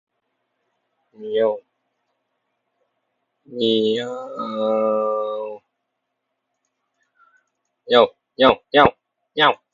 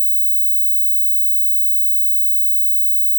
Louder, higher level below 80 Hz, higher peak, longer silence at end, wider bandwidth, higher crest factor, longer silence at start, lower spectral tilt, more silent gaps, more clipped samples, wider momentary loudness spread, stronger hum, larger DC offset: second, -19 LUFS vs -12 LUFS; first, -56 dBFS vs under -90 dBFS; first, 0 dBFS vs -12 dBFS; first, 0.2 s vs 0 s; second, 7.4 kHz vs 19 kHz; first, 22 dB vs 4 dB; first, 1.2 s vs 0 s; first, -5.5 dB/octave vs 0 dB/octave; neither; neither; first, 15 LU vs 0 LU; neither; neither